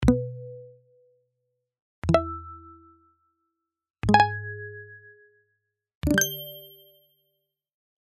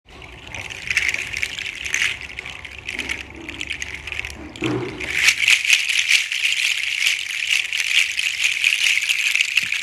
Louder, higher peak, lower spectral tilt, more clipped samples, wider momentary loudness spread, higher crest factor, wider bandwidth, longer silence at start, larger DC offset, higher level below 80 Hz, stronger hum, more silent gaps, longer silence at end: second, -25 LUFS vs -18 LUFS; second, -4 dBFS vs 0 dBFS; first, -4.5 dB/octave vs 0 dB/octave; neither; first, 24 LU vs 15 LU; about the same, 26 dB vs 22 dB; second, 13.5 kHz vs 16.5 kHz; about the same, 0 s vs 0.1 s; neither; first, -42 dBFS vs -48 dBFS; neither; first, 1.82-2.02 s, 3.90-3.94 s, 5.95-6.01 s vs none; first, 1.4 s vs 0 s